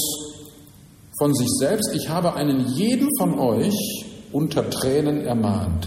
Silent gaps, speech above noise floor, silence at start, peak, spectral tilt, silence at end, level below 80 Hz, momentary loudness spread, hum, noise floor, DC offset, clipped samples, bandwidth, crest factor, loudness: none; 26 dB; 0 s; -8 dBFS; -5 dB/octave; 0 s; -46 dBFS; 9 LU; none; -47 dBFS; under 0.1%; under 0.1%; 16 kHz; 14 dB; -22 LUFS